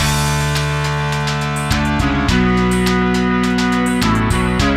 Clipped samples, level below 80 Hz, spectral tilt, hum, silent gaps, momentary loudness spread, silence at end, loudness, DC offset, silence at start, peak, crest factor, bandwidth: under 0.1%; -26 dBFS; -5 dB/octave; none; none; 3 LU; 0 s; -16 LUFS; under 0.1%; 0 s; -2 dBFS; 14 dB; 16 kHz